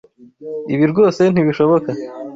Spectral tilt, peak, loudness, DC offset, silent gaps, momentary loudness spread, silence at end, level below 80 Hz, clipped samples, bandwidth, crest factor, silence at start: -8 dB/octave; -2 dBFS; -15 LUFS; under 0.1%; none; 15 LU; 0 s; -56 dBFS; under 0.1%; 7.8 kHz; 14 dB; 0.2 s